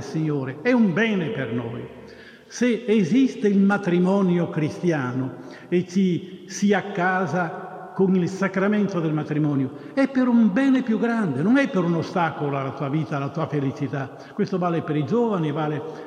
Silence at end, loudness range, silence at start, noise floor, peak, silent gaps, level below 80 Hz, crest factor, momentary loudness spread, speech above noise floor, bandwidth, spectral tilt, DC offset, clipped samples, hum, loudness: 0 s; 4 LU; 0 s; -44 dBFS; -8 dBFS; none; -68 dBFS; 14 dB; 10 LU; 22 dB; 9.6 kHz; -7 dB/octave; under 0.1%; under 0.1%; none; -22 LUFS